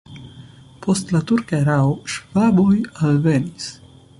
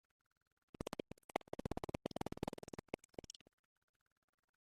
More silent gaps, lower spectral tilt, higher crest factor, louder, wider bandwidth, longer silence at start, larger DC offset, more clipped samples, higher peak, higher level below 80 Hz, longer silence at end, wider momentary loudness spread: second, none vs 1.24-1.29 s; about the same, -6.5 dB/octave vs -5.5 dB/octave; second, 14 dB vs 32 dB; first, -19 LUFS vs -49 LUFS; second, 11.5 kHz vs 14.5 kHz; second, 0.1 s vs 0.8 s; neither; neither; first, -6 dBFS vs -20 dBFS; first, -50 dBFS vs -64 dBFS; second, 0.45 s vs 2.15 s; first, 15 LU vs 9 LU